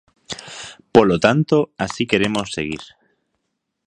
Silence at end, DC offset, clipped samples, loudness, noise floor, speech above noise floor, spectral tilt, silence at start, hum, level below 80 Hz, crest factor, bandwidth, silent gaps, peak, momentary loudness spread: 1 s; under 0.1%; under 0.1%; -18 LUFS; -75 dBFS; 58 dB; -5.5 dB/octave; 0.3 s; none; -50 dBFS; 20 dB; 10.5 kHz; none; 0 dBFS; 18 LU